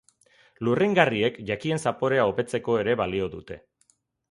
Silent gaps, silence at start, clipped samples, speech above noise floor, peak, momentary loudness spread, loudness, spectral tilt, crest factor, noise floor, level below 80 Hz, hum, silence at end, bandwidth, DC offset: none; 0.6 s; under 0.1%; 43 dB; -2 dBFS; 12 LU; -25 LUFS; -6 dB/octave; 24 dB; -67 dBFS; -56 dBFS; none; 0.75 s; 11.5 kHz; under 0.1%